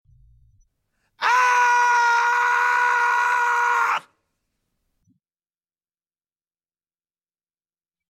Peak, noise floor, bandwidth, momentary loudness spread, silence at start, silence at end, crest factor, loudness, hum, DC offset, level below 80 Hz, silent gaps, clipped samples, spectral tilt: -6 dBFS; under -90 dBFS; 14 kHz; 4 LU; 1.2 s; 4.1 s; 16 dB; -19 LUFS; none; under 0.1%; -68 dBFS; none; under 0.1%; 1.5 dB/octave